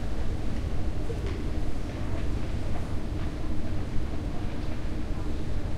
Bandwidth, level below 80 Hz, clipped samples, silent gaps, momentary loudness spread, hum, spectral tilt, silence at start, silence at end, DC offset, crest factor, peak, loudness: 9.4 kHz; -32 dBFS; under 0.1%; none; 2 LU; none; -7 dB/octave; 0 s; 0 s; under 0.1%; 12 dB; -14 dBFS; -34 LUFS